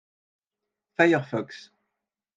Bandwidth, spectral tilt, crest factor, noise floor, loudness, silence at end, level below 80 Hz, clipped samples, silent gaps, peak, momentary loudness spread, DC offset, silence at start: 7.6 kHz; -6.5 dB/octave; 24 dB; -87 dBFS; -24 LUFS; 0.75 s; -80 dBFS; under 0.1%; none; -4 dBFS; 19 LU; under 0.1%; 1 s